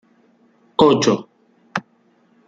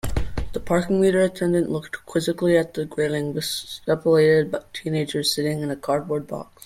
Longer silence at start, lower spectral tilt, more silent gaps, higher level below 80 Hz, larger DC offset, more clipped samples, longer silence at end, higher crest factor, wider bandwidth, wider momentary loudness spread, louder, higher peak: first, 0.8 s vs 0.05 s; about the same, -5 dB/octave vs -5.5 dB/octave; neither; second, -58 dBFS vs -38 dBFS; neither; neither; first, 0.7 s vs 0.2 s; about the same, 20 dB vs 16 dB; second, 7.8 kHz vs 16 kHz; first, 15 LU vs 10 LU; first, -18 LUFS vs -23 LUFS; first, -2 dBFS vs -6 dBFS